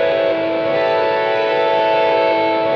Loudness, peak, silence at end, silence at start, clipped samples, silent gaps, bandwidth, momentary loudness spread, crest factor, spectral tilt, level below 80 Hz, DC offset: -16 LUFS; -4 dBFS; 0 s; 0 s; under 0.1%; none; 6.4 kHz; 3 LU; 10 dB; -6 dB/octave; -56 dBFS; under 0.1%